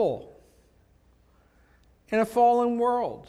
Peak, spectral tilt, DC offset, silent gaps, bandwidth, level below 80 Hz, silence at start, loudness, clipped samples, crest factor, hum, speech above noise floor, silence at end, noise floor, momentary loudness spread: -10 dBFS; -6.5 dB/octave; under 0.1%; none; 14 kHz; -62 dBFS; 0 s; -24 LUFS; under 0.1%; 18 dB; none; 37 dB; 0.05 s; -61 dBFS; 8 LU